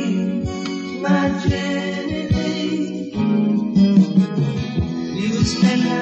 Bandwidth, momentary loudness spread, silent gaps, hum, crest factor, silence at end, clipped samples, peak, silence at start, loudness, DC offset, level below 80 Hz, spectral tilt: 8.4 kHz; 9 LU; none; none; 16 dB; 0 s; under 0.1%; -4 dBFS; 0 s; -19 LUFS; under 0.1%; -40 dBFS; -6.5 dB/octave